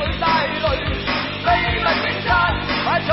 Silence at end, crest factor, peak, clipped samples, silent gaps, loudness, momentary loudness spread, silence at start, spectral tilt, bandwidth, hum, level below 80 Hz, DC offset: 0 s; 16 dB; -4 dBFS; under 0.1%; none; -19 LUFS; 4 LU; 0 s; -8.5 dB/octave; 6 kHz; 50 Hz at -35 dBFS; -32 dBFS; 0.2%